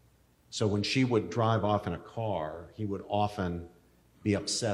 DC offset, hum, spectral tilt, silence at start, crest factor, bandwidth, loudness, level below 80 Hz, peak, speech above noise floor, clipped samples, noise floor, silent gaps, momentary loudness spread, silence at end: under 0.1%; none; -5.5 dB/octave; 0.5 s; 18 dB; 12.5 kHz; -31 LUFS; -62 dBFS; -14 dBFS; 34 dB; under 0.1%; -64 dBFS; none; 10 LU; 0 s